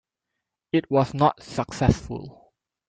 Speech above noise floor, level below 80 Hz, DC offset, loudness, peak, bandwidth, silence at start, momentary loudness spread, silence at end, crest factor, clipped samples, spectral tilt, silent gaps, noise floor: 60 dB; -44 dBFS; under 0.1%; -24 LUFS; -4 dBFS; 9.2 kHz; 0.75 s; 15 LU; 0.6 s; 22 dB; under 0.1%; -7 dB/octave; none; -83 dBFS